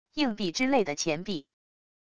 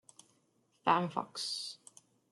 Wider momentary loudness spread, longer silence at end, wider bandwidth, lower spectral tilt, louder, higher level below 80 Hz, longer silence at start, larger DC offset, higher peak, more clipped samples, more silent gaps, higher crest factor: second, 10 LU vs 13 LU; about the same, 0.65 s vs 0.55 s; second, 11 kHz vs 12.5 kHz; about the same, -3.5 dB/octave vs -3.5 dB/octave; first, -29 LUFS vs -35 LUFS; first, -60 dBFS vs -86 dBFS; second, 0.05 s vs 0.85 s; neither; about the same, -12 dBFS vs -14 dBFS; neither; neither; second, 18 dB vs 24 dB